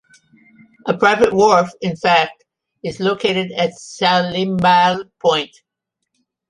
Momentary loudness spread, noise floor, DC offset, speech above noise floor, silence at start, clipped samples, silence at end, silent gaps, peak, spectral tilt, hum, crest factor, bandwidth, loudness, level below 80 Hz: 11 LU; -78 dBFS; under 0.1%; 62 dB; 0.85 s; under 0.1%; 1.05 s; none; 0 dBFS; -4.5 dB/octave; none; 16 dB; 11.5 kHz; -16 LUFS; -56 dBFS